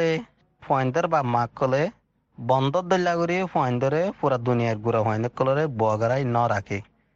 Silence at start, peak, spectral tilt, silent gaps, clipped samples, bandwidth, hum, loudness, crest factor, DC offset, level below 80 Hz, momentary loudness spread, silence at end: 0 s; -8 dBFS; -7 dB/octave; none; under 0.1%; 7.6 kHz; none; -24 LUFS; 16 dB; under 0.1%; -60 dBFS; 4 LU; 0.35 s